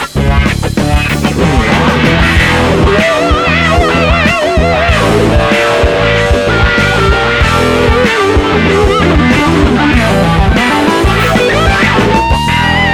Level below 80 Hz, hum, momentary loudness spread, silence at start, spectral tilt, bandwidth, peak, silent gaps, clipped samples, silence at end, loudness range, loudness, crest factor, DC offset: -16 dBFS; none; 2 LU; 0 s; -5.5 dB/octave; 19.5 kHz; 0 dBFS; none; under 0.1%; 0 s; 0 LU; -9 LUFS; 8 dB; under 0.1%